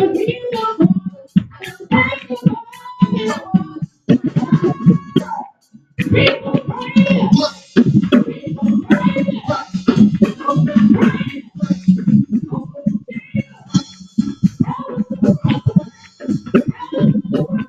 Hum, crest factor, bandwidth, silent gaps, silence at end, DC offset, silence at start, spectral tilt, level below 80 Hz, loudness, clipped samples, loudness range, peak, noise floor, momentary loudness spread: none; 16 dB; 7.8 kHz; none; 0 s; under 0.1%; 0 s; -7.5 dB/octave; -48 dBFS; -16 LUFS; under 0.1%; 4 LU; 0 dBFS; -47 dBFS; 11 LU